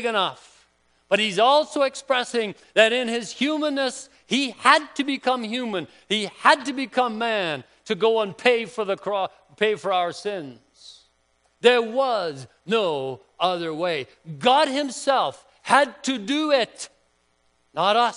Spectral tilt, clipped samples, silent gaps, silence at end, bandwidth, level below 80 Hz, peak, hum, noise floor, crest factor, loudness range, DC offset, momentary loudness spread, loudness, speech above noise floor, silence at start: -3 dB/octave; under 0.1%; none; 0 s; 10.5 kHz; -72 dBFS; 0 dBFS; none; -66 dBFS; 22 dB; 3 LU; under 0.1%; 12 LU; -22 LUFS; 44 dB; 0 s